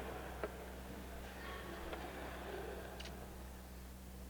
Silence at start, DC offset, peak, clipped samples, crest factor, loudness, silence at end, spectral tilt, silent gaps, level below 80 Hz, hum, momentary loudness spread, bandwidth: 0 s; under 0.1%; -26 dBFS; under 0.1%; 22 dB; -49 LUFS; 0 s; -5 dB/octave; none; -54 dBFS; none; 6 LU; over 20 kHz